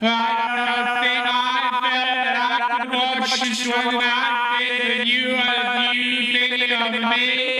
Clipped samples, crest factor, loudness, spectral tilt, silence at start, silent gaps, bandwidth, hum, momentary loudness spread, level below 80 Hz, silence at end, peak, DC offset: under 0.1%; 16 dB; -19 LUFS; -1.5 dB/octave; 0 s; none; 14 kHz; none; 3 LU; -70 dBFS; 0 s; -4 dBFS; under 0.1%